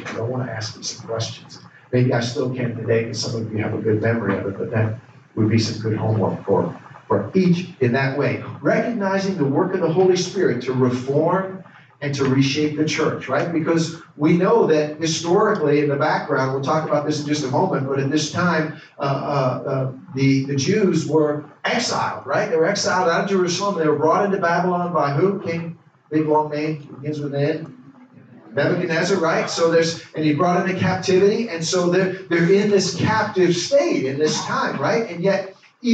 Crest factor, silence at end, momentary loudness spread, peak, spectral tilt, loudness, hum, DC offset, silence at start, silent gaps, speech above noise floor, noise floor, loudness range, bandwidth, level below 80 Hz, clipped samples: 16 dB; 0 s; 9 LU; -4 dBFS; -5.5 dB/octave; -20 LUFS; none; under 0.1%; 0 s; none; 26 dB; -46 dBFS; 4 LU; 9 kHz; -62 dBFS; under 0.1%